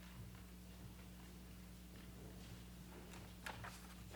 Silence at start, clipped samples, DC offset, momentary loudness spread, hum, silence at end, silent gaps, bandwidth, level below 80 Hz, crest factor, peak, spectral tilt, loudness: 0 s; under 0.1%; under 0.1%; 6 LU; none; 0 s; none; over 20 kHz; -60 dBFS; 22 dB; -34 dBFS; -4.5 dB/octave; -56 LUFS